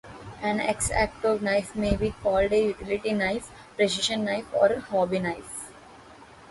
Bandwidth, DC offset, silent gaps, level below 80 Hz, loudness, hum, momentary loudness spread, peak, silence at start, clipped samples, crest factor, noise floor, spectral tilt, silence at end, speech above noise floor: 11.5 kHz; under 0.1%; none; -44 dBFS; -26 LUFS; none; 11 LU; -8 dBFS; 0.05 s; under 0.1%; 18 dB; -49 dBFS; -4 dB/octave; 0 s; 23 dB